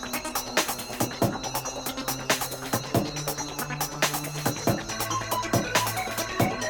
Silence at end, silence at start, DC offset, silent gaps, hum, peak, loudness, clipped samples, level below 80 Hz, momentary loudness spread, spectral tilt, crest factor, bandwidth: 0 s; 0 s; under 0.1%; none; none; -8 dBFS; -28 LUFS; under 0.1%; -50 dBFS; 5 LU; -3.5 dB/octave; 20 dB; 19 kHz